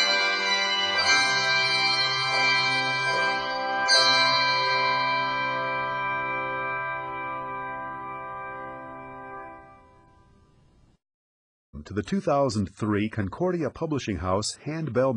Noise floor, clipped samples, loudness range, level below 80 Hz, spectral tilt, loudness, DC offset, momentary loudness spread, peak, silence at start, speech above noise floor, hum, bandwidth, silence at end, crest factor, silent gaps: -59 dBFS; under 0.1%; 18 LU; -56 dBFS; -3 dB/octave; -24 LUFS; under 0.1%; 16 LU; -8 dBFS; 0 s; 33 dB; none; 11 kHz; 0 s; 18 dB; 11.14-11.73 s